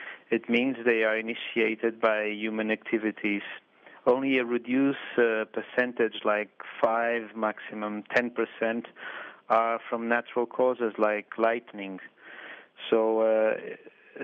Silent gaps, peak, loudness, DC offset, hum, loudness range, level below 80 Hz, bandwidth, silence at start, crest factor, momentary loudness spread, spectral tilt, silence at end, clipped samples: none; -10 dBFS; -28 LUFS; under 0.1%; none; 2 LU; -82 dBFS; 7 kHz; 0 s; 18 dB; 14 LU; -6.5 dB/octave; 0 s; under 0.1%